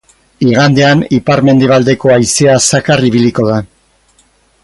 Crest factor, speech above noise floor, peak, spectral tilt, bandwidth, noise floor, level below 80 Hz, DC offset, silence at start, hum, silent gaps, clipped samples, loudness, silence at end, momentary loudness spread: 10 dB; 42 dB; 0 dBFS; -5 dB/octave; 11.5 kHz; -51 dBFS; -42 dBFS; under 0.1%; 0.4 s; none; none; under 0.1%; -9 LUFS; 1 s; 5 LU